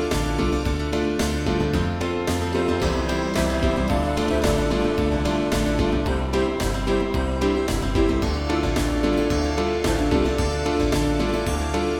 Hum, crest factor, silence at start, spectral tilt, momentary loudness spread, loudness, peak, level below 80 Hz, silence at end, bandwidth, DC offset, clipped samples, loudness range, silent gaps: none; 14 dB; 0 s; -5.5 dB/octave; 3 LU; -23 LUFS; -8 dBFS; -28 dBFS; 0 s; 18 kHz; 0.3%; under 0.1%; 1 LU; none